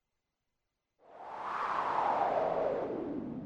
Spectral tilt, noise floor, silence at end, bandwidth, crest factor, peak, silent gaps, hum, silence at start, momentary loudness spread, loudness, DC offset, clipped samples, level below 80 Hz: -6.5 dB/octave; -86 dBFS; 0 s; 9.4 kHz; 16 dB; -18 dBFS; none; none; 1.1 s; 12 LU; -34 LUFS; under 0.1%; under 0.1%; -68 dBFS